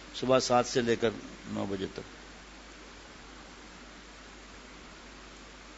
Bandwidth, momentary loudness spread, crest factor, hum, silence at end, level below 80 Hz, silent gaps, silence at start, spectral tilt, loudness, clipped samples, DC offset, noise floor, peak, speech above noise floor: 8 kHz; 22 LU; 24 dB; none; 0 s; -56 dBFS; none; 0 s; -4 dB/octave; -30 LUFS; under 0.1%; under 0.1%; -50 dBFS; -12 dBFS; 20 dB